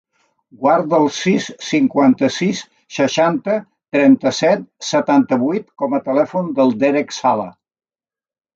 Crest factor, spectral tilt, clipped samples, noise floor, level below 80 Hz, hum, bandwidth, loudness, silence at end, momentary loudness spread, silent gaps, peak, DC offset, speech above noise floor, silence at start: 16 dB; -5 dB/octave; under 0.1%; under -90 dBFS; -64 dBFS; none; 7.8 kHz; -16 LUFS; 1.05 s; 8 LU; none; -2 dBFS; under 0.1%; over 74 dB; 0.6 s